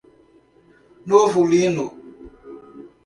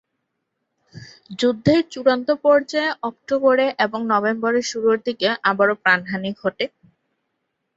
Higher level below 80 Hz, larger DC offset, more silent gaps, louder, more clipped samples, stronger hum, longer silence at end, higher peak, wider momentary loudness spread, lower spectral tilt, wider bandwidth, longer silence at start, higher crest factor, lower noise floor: about the same, -58 dBFS vs -60 dBFS; neither; neither; about the same, -18 LUFS vs -20 LUFS; neither; neither; second, 0.2 s vs 1.1 s; about the same, -2 dBFS vs -2 dBFS; first, 25 LU vs 8 LU; about the same, -5.5 dB/octave vs -5 dB/octave; first, 11.5 kHz vs 8 kHz; about the same, 1.05 s vs 0.95 s; about the same, 20 dB vs 18 dB; second, -54 dBFS vs -76 dBFS